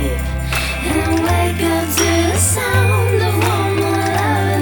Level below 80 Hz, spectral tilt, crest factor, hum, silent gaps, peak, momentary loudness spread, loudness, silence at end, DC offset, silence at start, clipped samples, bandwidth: -28 dBFS; -4.5 dB/octave; 14 dB; none; none; -2 dBFS; 4 LU; -16 LUFS; 0 s; under 0.1%; 0 s; under 0.1%; over 20 kHz